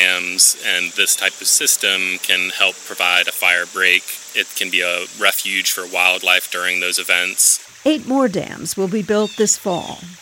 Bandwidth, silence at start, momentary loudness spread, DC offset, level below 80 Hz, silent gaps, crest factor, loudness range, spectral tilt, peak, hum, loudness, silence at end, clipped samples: over 20 kHz; 0 s; 8 LU; under 0.1%; -64 dBFS; none; 18 dB; 2 LU; -0.5 dB/octave; 0 dBFS; none; -15 LUFS; 0.05 s; under 0.1%